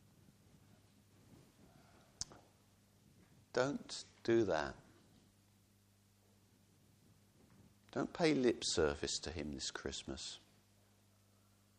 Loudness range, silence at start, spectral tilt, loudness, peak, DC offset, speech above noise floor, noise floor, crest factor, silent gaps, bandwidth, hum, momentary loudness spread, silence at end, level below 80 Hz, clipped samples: 13 LU; 1.3 s; -4 dB/octave; -39 LUFS; -20 dBFS; under 0.1%; 33 dB; -71 dBFS; 24 dB; none; 13 kHz; 50 Hz at -70 dBFS; 14 LU; 1.4 s; -64 dBFS; under 0.1%